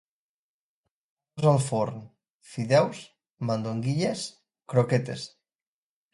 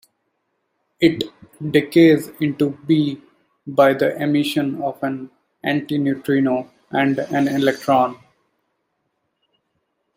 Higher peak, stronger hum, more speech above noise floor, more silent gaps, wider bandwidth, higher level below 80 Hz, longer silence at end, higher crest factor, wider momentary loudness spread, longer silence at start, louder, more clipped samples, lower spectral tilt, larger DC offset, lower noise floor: second, -8 dBFS vs -2 dBFS; neither; first, over 64 dB vs 54 dB; first, 2.30-2.40 s vs none; second, 11.5 kHz vs 16 kHz; about the same, -66 dBFS vs -62 dBFS; second, 0.85 s vs 2 s; about the same, 20 dB vs 18 dB; first, 18 LU vs 12 LU; first, 1.35 s vs 1 s; second, -27 LUFS vs -19 LUFS; neither; about the same, -6.5 dB/octave vs -6.5 dB/octave; neither; first, under -90 dBFS vs -72 dBFS